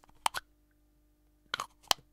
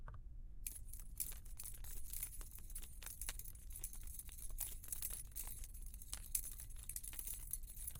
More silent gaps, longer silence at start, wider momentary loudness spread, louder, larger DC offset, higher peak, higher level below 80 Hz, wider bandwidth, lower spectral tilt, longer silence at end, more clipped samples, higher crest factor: neither; first, 0.25 s vs 0 s; about the same, 8 LU vs 9 LU; first, -36 LUFS vs -48 LUFS; neither; first, -6 dBFS vs -18 dBFS; second, -66 dBFS vs -52 dBFS; about the same, 16.5 kHz vs 17 kHz; second, 0.5 dB/octave vs -1.5 dB/octave; first, 0.2 s vs 0 s; neither; about the same, 34 dB vs 30 dB